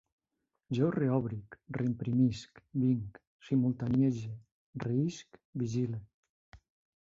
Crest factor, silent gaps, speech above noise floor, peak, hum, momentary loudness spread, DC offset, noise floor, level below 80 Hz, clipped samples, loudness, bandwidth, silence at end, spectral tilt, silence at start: 18 dB; 3.27-3.39 s, 4.52-4.73 s, 5.45-5.53 s, 6.14-6.23 s, 6.29-6.52 s; 53 dB; -16 dBFS; none; 15 LU; under 0.1%; -85 dBFS; -64 dBFS; under 0.1%; -33 LUFS; 7.6 kHz; 0.5 s; -8 dB/octave; 0.7 s